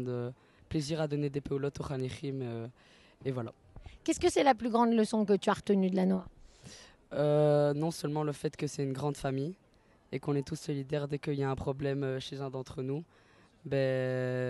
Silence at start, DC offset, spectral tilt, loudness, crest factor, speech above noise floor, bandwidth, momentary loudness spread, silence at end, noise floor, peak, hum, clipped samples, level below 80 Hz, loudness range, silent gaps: 0 s; under 0.1%; -6.5 dB/octave; -33 LUFS; 20 dB; 22 dB; 12.5 kHz; 13 LU; 0 s; -54 dBFS; -12 dBFS; none; under 0.1%; -60 dBFS; 7 LU; none